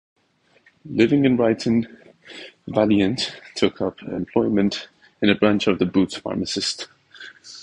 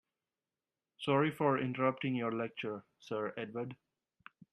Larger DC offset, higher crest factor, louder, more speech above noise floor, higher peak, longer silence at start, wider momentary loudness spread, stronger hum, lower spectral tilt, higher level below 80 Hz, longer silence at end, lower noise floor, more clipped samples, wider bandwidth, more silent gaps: neither; about the same, 20 dB vs 20 dB; first, -21 LUFS vs -36 LUFS; second, 41 dB vs over 55 dB; first, -2 dBFS vs -16 dBFS; second, 0.85 s vs 1 s; first, 20 LU vs 11 LU; neither; second, -5.5 dB/octave vs -7.5 dB/octave; first, -54 dBFS vs -78 dBFS; second, 0 s vs 0.8 s; second, -61 dBFS vs under -90 dBFS; neither; second, 10.5 kHz vs 12 kHz; neither